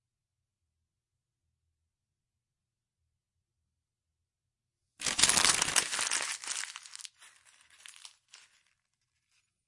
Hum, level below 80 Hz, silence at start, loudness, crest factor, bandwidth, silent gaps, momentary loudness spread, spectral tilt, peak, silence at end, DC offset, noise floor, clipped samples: none; -68 dBFS; 5 s; -27 LUFS; 34 dB; 11.5 kHz; none; 24 LU; 1 dB/octave; -4 dBFS; 1.6 s; under 0.1%; -89 dBFS; under 0.1%